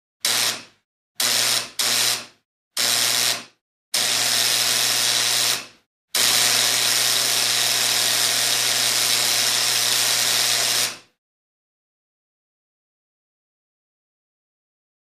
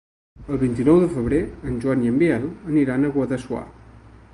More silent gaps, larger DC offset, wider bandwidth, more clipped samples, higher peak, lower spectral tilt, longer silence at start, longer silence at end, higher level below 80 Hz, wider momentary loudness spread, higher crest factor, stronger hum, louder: first, 0.85-1.15 s, 2.45-2.71 s, 3.61-3.92 s, 5.86-6.08 s vs none; neither; first, 15.5 kHz vs 11.5 kHz; neither; about the same, -4 dBFS vs -4 dBFS; second, 1.5 dB/octave vs -8.5 dB/octave; second, 0.25 s vs 0.4 s; first, 4.05 s vs 0.35 s; second, -72 dBFS vs -42 dBFS; second, 6 LU vs 12 LU; about the same, 18 dB vs 16 dB; neither; first, -18 LUFS vs -21 LUFS